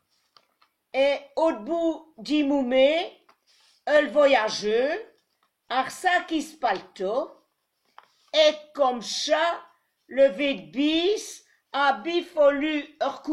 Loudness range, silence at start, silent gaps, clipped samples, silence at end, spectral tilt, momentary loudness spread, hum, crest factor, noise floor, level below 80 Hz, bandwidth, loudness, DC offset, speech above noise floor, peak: 4 LU; 0.95 s; none; under 0.1%; 0 s; -3 dB/octave; 10 LU; none; 16 dB; -73 dBFS; -64 dBFS; 12.5 kHz; -24 LUFS; under 0.1%; 49 dB; -8 dBFS